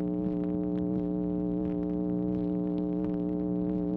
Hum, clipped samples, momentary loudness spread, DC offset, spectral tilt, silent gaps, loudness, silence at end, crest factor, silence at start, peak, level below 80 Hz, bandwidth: none; under 0.1%; 1 LU; under 0.1%; -12.5 dB/octave; none; -31 LUFS; 0 s; 12 dB; 0 s; -18 dBFS; -50 dBFS; 3.9 kHz